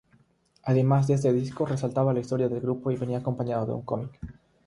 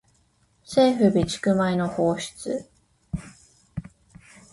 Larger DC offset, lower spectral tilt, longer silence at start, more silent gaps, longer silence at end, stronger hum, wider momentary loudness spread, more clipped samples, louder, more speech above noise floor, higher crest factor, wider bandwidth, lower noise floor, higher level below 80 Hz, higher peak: neither; first, -8.5 dB/octave vs -6 dB/octave; about the same, 0.65 s vs 0.7 s; neither; second, 0.35 s vs 0.7 s; neither; second, 11 LU vs 19 LU; neither; second, -27 LUFS vs -23 LUFS; second, 38 dB vs 42 dB; about the same, 18 dB vs 18 dB; about the same, 11 kHz vs 11.5 kHz; about the same, -63 dBFS vs -64 dBFS; second, -56 dBFS vs -50 dBFS; about the same, -10 dBFS vs -8 dBFS